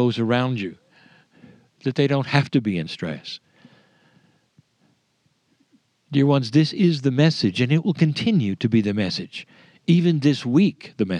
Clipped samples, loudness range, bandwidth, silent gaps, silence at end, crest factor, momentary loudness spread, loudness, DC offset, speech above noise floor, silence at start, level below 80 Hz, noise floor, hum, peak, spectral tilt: under 0.1%; 10 LU; 9.8 kHz; none; 0 s; 22 dB; 12 LU; -21 LUFS; under 0.1%; 47 dB; 0 s; -66 dBFS; -67 dBFS; none; 0 dBFS; -7 dB/octave